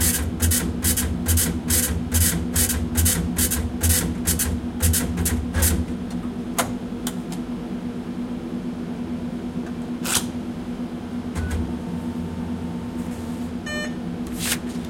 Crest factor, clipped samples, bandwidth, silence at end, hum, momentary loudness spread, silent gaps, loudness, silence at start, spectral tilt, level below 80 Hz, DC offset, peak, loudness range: 20 dB; under 0.1%; 17 kHz; 0 s; none; 10 LU; none; -24 LUFS; 0 s; -4 dB/octave; -34 dBFS; under 0.1%; -4 dBFS; 8 LU